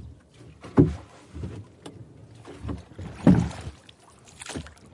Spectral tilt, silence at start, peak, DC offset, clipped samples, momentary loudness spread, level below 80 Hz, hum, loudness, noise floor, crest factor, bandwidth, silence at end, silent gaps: -8 dB/octave; 0 s; -2 dBFS; under 0.1%; under 0.1%; 26 LU; -44 dBFS; none; -25 LUFS; -52 dBFS; 26 dB; 11.5 kHz; 0.25 s; none